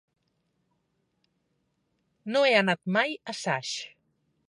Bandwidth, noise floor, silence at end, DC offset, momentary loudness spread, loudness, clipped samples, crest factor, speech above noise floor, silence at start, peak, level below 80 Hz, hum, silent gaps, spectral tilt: 11.5 kHz; -76 dBFS; 0.6 s; under 0.1%; 15 LU; -26 LUFS; under 0.1%; 24 dB; 49 dB; 2.25 s; -8 dBFS; -82 dBFS; none; none; -4 dB/octave